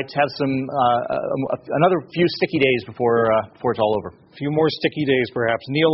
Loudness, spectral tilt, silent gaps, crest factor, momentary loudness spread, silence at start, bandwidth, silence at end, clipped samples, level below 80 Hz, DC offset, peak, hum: -20 LUFS; -4 dB/octave; none; 18 dB; 6 LU; 0 s; 6 kHz; 0 s; under 0.1%; -56 dBFS; under 0.1%; -2 dBFS; none